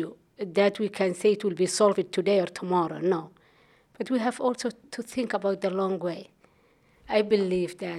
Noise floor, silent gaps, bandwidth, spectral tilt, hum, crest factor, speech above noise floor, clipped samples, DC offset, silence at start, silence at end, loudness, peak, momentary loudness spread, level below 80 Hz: -63 dBFS; none; 14 kHz; -5 dB/octave; none; 18 dB; 36 dB; under 0.1%; under 0.1%; 0 s; 0 s; -27 LUFS; -8 dBFS; 11 LU; -68 dBFS